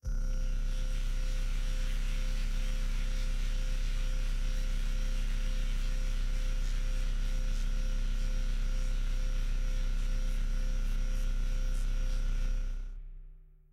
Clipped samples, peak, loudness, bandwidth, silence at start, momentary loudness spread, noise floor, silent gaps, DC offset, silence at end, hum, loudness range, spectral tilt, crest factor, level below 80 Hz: under 0.1%; -22 dBFS; -38 LUFS; 9.4 kHz; 0.05 s; 1 LU; -52 dBFS; none; under 0.1%; 0.3 s; none; 0 LU; -4.5 dB/octave; 8 dB; -30 dBFS